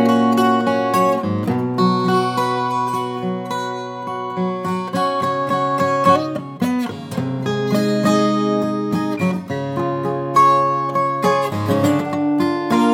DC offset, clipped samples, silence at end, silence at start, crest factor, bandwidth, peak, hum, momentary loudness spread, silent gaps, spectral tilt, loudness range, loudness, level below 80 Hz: under 0.1%; under 0.1%; 0 s; 0 s; 16 dB; 16.5 kHz; -2 dBFS; none; 9 LU; none; -6.5 dB/octave; 4 LU; -19 LUFS; -66 dBFS